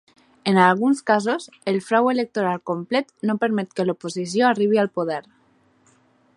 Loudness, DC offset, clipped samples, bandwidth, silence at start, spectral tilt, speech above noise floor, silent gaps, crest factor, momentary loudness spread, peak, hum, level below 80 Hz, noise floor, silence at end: -21 LUFS; under 0.1%; under 0.1%; 11 kHz; 0.45 s; -5.5 dB/octave; 39 dB; none; 20 dB; 10 LU; 0 dBFS; none; -72 dBFS; -60 dBFS; 1.15 s